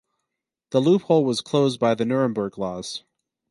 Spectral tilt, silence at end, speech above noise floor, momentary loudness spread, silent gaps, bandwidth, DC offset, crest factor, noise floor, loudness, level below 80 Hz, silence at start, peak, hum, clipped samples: -6 dB/octave; 0.5 s; 62 dB; 12 LU; none; 11.5 kHz; under 0.1%; 18 dB; -83 dBFS; -22 LUFS; -62 dBFS; 0.7 s; -6 dBFS; none; under 0.1%